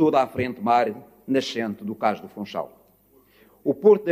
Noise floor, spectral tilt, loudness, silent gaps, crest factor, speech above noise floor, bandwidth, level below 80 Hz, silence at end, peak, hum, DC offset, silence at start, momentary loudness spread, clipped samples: -58 dBFS; -6 dB/octave; -24 LUFS; none; 18 dB; 36 dB; 15 kHz; -62 dBFS; 0 s; -6 dBFS; 50 Hz at -65 dBFS; under 0.1%; 0 s; 14 LU; under 0.1%